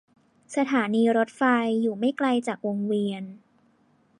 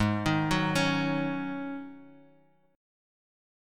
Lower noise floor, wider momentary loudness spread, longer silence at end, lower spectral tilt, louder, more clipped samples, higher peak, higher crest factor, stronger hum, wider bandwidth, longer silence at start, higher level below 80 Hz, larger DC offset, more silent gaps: about the same, -63 dBFS vs -64 dBFS; second, 9 LU vs 13 LU; second, 0.8 s vs 1.6 s; about the same, -6 dB/octave vs -5.5 dB/octave; first, -25 LUFS vs -29 LUFS; neither; about the same, -10 dBFS vs -12 dBFS; about the same, 16 dB vs 20 dB; neither; second, 10.5 kHz vs 17.5 kHz; first, 0.5 s vs 0 s; second, -78 dBFS vs -52 dBFS; neither; neither